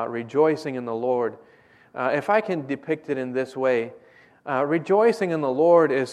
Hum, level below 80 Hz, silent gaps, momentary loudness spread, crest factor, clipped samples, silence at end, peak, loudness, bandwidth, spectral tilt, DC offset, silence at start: none; -74 dBFS; none; 11 LU; 18 dB; under 0.1%; 0 s; -6 dBFS; -23 LUFS; 11 kHz; -7 dB/octave; under 0.1%; 0 s